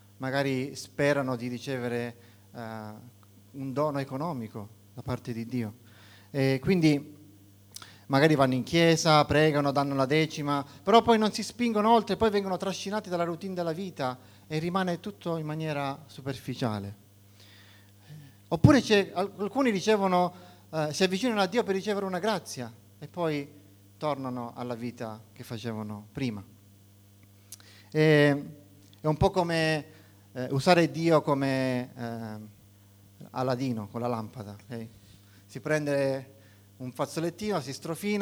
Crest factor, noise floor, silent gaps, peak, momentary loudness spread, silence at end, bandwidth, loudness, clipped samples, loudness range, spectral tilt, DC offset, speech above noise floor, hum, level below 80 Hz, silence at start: 24 dB; -56 dBFS; none; -4 dBFS; 19 LU; 0 s; over 20 kHz; -28 LUFS; under 0.1%; 11 LU; -6 dB/octave; under 0.1%; 29 dB; none; -56 dBFS; 0.2 s